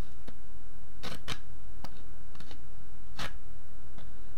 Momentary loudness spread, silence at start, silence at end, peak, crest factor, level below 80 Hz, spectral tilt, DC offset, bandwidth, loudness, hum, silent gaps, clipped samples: 13 LU; 0 s; 0 s; -16 dBFS; 24 dB; -50 dBFS; -4 dB/octave; 9%; 16 kHz; -47 LUFS; none; none; under 0.1%